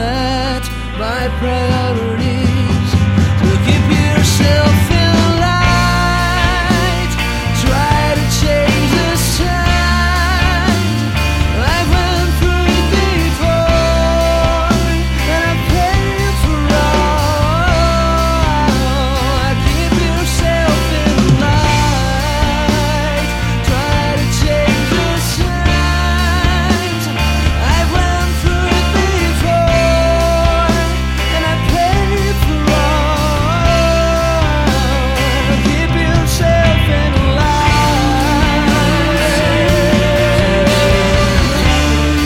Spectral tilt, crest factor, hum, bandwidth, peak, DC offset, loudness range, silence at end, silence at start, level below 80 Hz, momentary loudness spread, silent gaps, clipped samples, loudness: -5 dB/octave; 12 dB; none; 16.5 kHz; 0 dBFS; 0.2%; 2 LU; 0 s; 0 s; -18 dBFS; 4 LU; none; under 0.1%; -13 LUFS